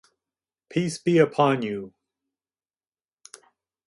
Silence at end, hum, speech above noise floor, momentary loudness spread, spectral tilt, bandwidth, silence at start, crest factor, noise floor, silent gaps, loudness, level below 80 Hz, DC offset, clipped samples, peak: 2 s; none; over 68 dB; 14 LU; -6 dB/octave; 11.5 kHz; 0.7 s; 22 dB; under -90 dBFS; none; -23 LUFS; -70 dBFS; under 0.1%; under 0.1%; -6 dBFS